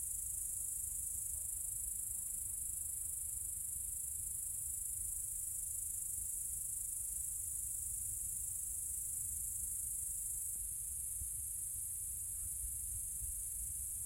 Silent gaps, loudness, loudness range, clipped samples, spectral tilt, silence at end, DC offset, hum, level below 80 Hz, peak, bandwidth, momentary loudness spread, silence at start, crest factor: none; -39 LUFS; 1 LU; under 0.1%; -1 dB/octave; 0 s; under 0.1%; none; -58 dBFS; -26 dBFS; 16.5 kHz; 1 LU; 0 s; 16 dB